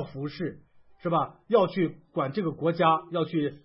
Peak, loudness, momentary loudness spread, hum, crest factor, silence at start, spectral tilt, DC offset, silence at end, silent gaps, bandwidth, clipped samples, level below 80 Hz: -10 dBFS; -28 LUFS; 12 LU; none; 18 dB; 0 s; -11 dB/octave; under 0.1%; 0.05 s; none; 5.8 kHz; under 0.1%; -66 dBFS